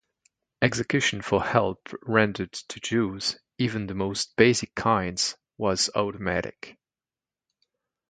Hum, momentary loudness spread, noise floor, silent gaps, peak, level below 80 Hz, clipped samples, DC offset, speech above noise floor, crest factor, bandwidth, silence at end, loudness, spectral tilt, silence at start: none; 11 LU; under -90 dBFS; none; -2 dBFS; -54 dBFS; under 0.1%; under 0.1%; over 64 dB; 24 dB; 9.6 kHz; 1.4 s; -26 LUFS; -4 dB/octave; 0.6 s